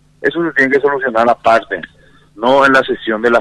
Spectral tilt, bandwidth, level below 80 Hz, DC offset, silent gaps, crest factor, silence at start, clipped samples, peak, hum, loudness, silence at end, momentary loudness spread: -5 dB/octave; 11.5 kHz; -50 dBFS; under 0.1%; none; 14 dB; 0.2 s; under 0.1%; 0 dBFS; none; -13 LUFS; 0 s; 9 LU